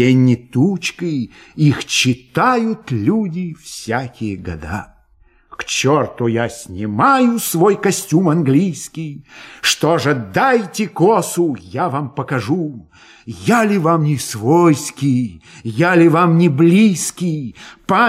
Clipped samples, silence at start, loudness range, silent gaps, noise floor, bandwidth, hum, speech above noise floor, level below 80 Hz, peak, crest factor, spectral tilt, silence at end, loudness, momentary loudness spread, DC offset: under 0.1%; 0 s; 7 LU; none; -52 dBFS; 16 kHz; none; 37 dB; -50 dBFS; -2 dBFS; 14 dB; -5.5 dB/octave; 0 s; -16 LUFS; 14 LU; under 0.1%